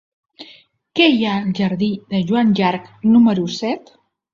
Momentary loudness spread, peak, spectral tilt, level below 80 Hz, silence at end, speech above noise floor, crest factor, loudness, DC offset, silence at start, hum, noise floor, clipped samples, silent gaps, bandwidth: 10 LU; 0 dBFS; -6.5 dB/octave; -58 dBFS; 0.55 s; 32 dB; 18 dB; -17 LUFS; under 0.1%; 0.4 s; none; -48 dBFS; under 0.1%; none; 7.4 kHz